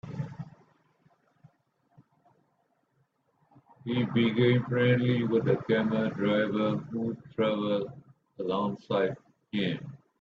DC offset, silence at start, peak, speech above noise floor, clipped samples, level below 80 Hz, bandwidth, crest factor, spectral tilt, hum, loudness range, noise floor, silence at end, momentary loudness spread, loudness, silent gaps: under 0.1%; 0.05 s; -12 dBFS; 46 dB; under 0.1%; -68 dBFS; 6.6 kHz; 18 dB; -8.5 dB/octave; none; 8 LU; -73 dBFS; 0.25 s; 14 LU; -29 LUFS; none